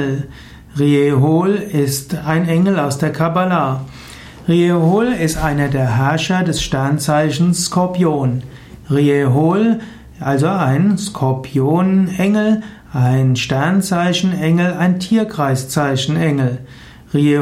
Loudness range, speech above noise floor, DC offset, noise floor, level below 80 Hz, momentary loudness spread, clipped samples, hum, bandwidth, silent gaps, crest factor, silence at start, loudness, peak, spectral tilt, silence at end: 1 LU; 21 dB; under 0.1%; -35 dBFS; -40 dBFS; 7 LU; under 0.1%; none; 15.5 kHz; none; 12 dB; 0 s; -16 LUFS; -2 dBFS; -6 dB/octave; 0 s